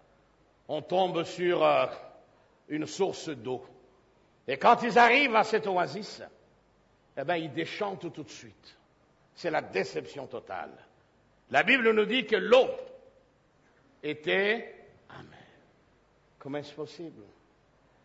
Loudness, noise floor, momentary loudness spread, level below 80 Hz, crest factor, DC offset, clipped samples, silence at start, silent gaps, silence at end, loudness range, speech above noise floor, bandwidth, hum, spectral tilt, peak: -27 LUFS; -65 dBFS; 23 LU; -72 dBFS; 22 dB; under 0.1%; under 0.1%; 0.7 s; none; 0.8 s; 11 LU; 37 dB; 8 kHz; none; -4.5 dB/octave; -8 dBFS